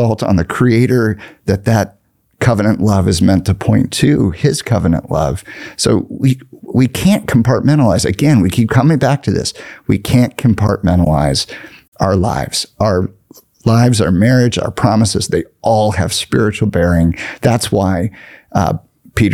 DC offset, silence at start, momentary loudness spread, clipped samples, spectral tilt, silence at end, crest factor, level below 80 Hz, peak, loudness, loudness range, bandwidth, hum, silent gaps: 0.2%; 0 s; 7 LU; under 0.1%; -6 dB/octave; 0 s; 12 dB; -36 dBFS; 0 dBFS; -14 LUFS; 2 LU; 15.5 kHz; none; 11.88-11.92 s